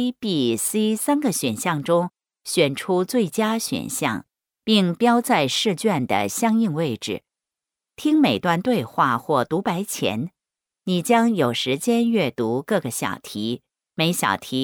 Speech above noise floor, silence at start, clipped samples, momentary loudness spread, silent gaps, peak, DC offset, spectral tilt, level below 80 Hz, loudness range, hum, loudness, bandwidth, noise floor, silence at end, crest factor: 67 dB; 0 s; under 0.1%; 10 LU; none; -6 dBFS; under 0.1%; -4.5 dB/octave; -66 dBFS; 2 LU; none; -22 LUFS; 19 kHz; -88 dBFS; 0 s; 16 dB